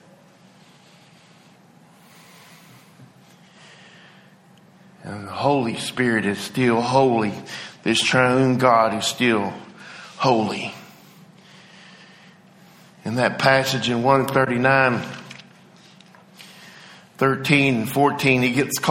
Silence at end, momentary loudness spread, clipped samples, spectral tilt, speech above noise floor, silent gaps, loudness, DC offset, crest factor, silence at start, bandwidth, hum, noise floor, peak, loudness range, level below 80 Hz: 0 s; 22 LU; under 0.1%; -5 dB/octave; 32 dB; none; -19 LUFS; under 0.1%; 22 dB; 3 s; 16.5 kHz; none; -51 dBFS; -2 dBFS; 9 LU; -60 dBFS